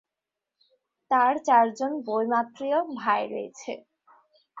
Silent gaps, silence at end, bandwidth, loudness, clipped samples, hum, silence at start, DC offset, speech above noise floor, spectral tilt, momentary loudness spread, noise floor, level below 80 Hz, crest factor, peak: none; 0 s; 7.8 kHz; -25 LUFS; under 0.1%; none; 1.1 s; under 0.1%; 62 dB; -4.5 dB/octave; 16 LU; -87 dBFS; -78 dBFS; 18 dB; -8 dBFS